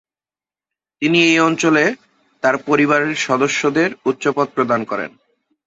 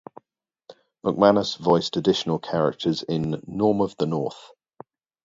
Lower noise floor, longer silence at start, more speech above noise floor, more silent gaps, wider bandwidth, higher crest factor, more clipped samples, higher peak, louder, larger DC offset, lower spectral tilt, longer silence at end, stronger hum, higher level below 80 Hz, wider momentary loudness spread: first, under -90 dBFS vs -78 dBFS; first, 1 s vs 0.7 s; first, over 74 dB vs 56 dB; neither; about the same, 8.2 kHz vs 7.8 kHz; second, 16 dB vs 22 dB; neither; about the same, -2 dBFS vs -2 dBFS; first, -16 LUFS vs -23 LUFS; neither; second, -4.5 dB/octave vs -6.5 dB/octave; second, 0.6 s vs 0.8 s; neither; about the same, -62 dBFS vs -58 dBFS; about the same, 9 LU vs 10 LU